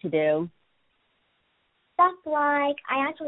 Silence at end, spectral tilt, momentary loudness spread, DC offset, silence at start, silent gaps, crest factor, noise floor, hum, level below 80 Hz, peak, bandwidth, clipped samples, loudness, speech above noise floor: 0 s; -9.5 dB/octave; 8 LU; under 0.1%; 0 s; none; 18 dB; -71 dBFS; none; -72 dBFS; -8 dBFS; 4.1 kHz; under 0.1%; -25 LUFS; 46 dB